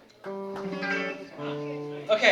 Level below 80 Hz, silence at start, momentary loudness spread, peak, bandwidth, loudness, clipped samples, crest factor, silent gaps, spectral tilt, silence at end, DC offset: -72 dBFS; 0.25 s; 9 LU; -6 dBFS; 12 kHz; -31 LUFS; under 0.1%; 24 dB; none; -4 dB/octave; 0 s; under 0.1%